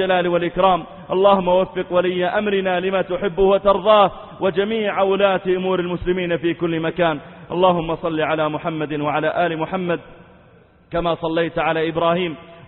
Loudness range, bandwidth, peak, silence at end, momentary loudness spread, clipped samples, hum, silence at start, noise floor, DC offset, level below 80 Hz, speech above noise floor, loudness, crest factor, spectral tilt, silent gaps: 5 LU; 4.2 kHz; -2 dBFS; 0.05 s; 8 LU; under 0.1%; none; 0 s; -50 dBFS; under 0.1%; -46 dBFS; 32 dB; -19 LUFS; 18 dB; -11 dB/octave; none